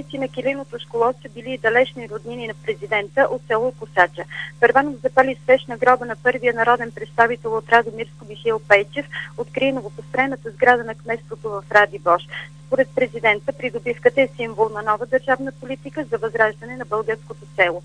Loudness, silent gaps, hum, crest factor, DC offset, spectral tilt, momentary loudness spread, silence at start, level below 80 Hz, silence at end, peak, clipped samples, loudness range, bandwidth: -20 LUFS; none; none; 20 dB; 0.2%; -5.5 dB/octave; 13 LU; 0 s; -56 dBFS; 0 s; 0 dBFS; under 0.1%; 4 LU; 10 kHz